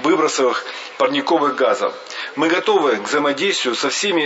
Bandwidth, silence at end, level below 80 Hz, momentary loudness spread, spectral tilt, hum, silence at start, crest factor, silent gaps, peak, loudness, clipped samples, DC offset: 8 kHz; 0 s; -74 dBFS; 8 LU; -2.5 dB/octave; none; 0 s; 14 dB; none; -4 dBFS; -18 LUFS; under 0.1%; under 0.1%